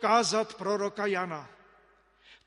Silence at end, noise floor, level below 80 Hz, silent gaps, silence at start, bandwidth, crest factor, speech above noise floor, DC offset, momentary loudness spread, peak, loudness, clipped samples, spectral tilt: 1 s; -63 dBFS; -74 dBFS; none; 0 s; 11.5 kHz; 20 dB; 35 dB; under 0.1%; 11 LU; -12 dBFS; -29 LUFS; under 0.1%; -3 dB/octave